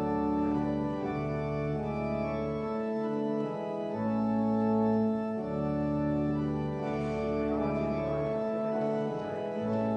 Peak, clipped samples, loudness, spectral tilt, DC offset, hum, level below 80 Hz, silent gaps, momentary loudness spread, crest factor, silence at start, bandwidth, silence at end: -16 dBFS; under 0.1%; -31 LUFS; -9 dB/octave; under 0.1%; none; -52 dBFS; none; 5 LU; 14 dB; 0 s; 7 kHz; 0 s